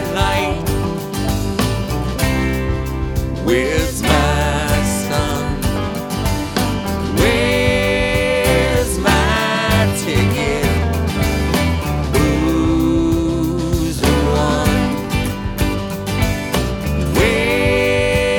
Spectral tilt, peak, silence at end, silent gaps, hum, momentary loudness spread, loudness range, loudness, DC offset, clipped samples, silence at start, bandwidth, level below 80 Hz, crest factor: -5 dB/octave; 0 dBFS; 0 s; none; none; 6 LU; 3 LU; -17 LUFS; under 0.1%; under 0.1%; 0 s; 19 kHz; -24 dBFS; 16 dB